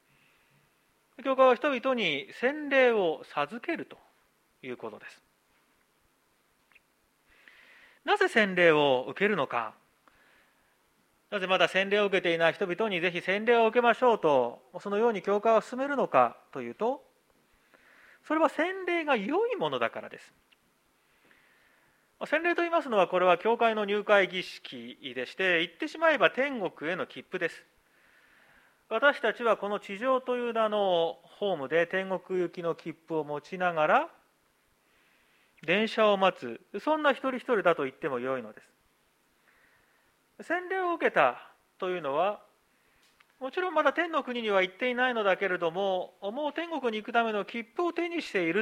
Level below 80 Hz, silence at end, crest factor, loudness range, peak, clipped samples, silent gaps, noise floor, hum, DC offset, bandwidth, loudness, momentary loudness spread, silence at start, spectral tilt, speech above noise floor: -80 dBFS; 0 s; 24 dB; 7 LU; -6 dBFS; under 0.1%; none; -70 dBFS; none; under 0.1%; 12.5 kHz; -28 LUFS; 13 LU; 1.2 s; -5 dB/octave; 42 dB